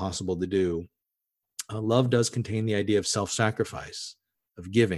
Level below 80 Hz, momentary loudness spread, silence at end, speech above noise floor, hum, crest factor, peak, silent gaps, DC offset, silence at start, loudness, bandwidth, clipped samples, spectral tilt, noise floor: -52 dBFS; 14 LU; 0 s; 58 dB; none; 20 dB; -8 dBFS; none; under 0.1%; 0 s; -27 LUFS; 12.5 kHz; under 0.1%; -5 dB/octave; -85 dBFS